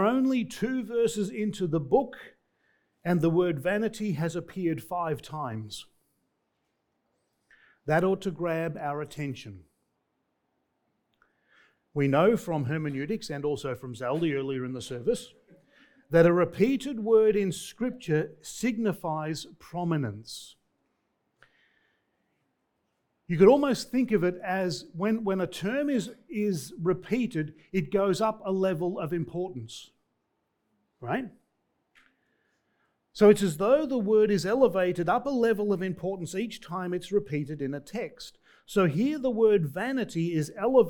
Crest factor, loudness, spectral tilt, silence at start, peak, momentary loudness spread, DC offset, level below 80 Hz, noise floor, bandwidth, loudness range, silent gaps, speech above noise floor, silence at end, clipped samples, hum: 22 dB; -28 LUFS; -6.5 dB/octave; 0 s; -6 dBFS; 13 LU; under 0.1%; -60 dBFS; -78 dBFS; 19 kHz; 11 LU; none; 51 dB; 0 s; under 0.1%; none